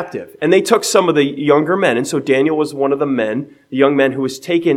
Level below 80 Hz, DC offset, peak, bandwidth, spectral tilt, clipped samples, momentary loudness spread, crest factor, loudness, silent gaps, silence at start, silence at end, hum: -66 dBFS; under 0.1%; 0 dBFS; 16 kHz; -4.5 dB/octave; under 0.1%; 8 LU; 14 dB; -15 LUFS; none; 0 s; 0 s; none